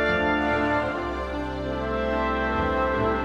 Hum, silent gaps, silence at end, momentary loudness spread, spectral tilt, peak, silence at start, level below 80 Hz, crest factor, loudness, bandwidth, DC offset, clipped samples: none; none; 0 s; 7 LU; -7 dB/octave; -12 dBFS; 0 s; -38 dBFS; 14 dB; -25 LUFS; 9.8 kHz; under 0.1%; under 0.1%